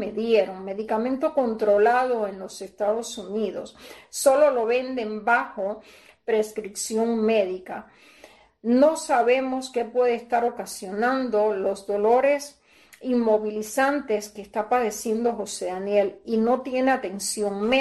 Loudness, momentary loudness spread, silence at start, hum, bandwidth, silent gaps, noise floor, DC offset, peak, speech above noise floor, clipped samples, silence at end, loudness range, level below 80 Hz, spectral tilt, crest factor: -24 LUFS; 12 LU; 0 s; none; 12.5 kHz; none; -52 dBFS; under 0.1%; -6 dBFS; 29 dB; under 0.1%; 0 s; 2 LU; -64 dBFS; -4 dB/octave; 16 dB